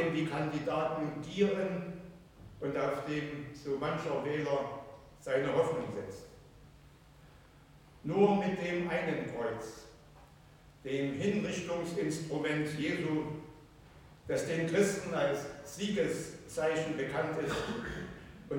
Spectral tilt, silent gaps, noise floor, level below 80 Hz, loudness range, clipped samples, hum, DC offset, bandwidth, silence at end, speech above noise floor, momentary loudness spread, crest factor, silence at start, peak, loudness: -5.5 dB/octave; none; -58 dBFS; -62 dBFS; 3 LU; under 0.1%; none; under 0.1%; 17 kHz; 0 s; 25 dB; 16 LU; 20 dB; 0 s; -16 dBFS; -34 LUFS